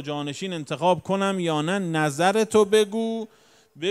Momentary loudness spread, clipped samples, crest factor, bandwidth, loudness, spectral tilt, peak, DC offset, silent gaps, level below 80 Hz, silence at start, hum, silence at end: 11 LU; under 0.1%; 18 dB; 13.5 kHz; -23 LUFS; -5 dB/octave; -6 dBFS; under 0.1%; none; -70 dBFS; 0 s; none; 0 s